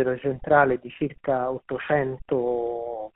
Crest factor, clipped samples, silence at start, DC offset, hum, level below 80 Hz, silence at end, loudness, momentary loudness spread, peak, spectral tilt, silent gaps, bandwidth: 22 dB; under 0.1%; 0 s; under 0.1%; none; -52 dBFS; 0.05 s; -25 LUFS; 11 LU; -4 dBFS; -5.5 dB/octave; none; 4 kHz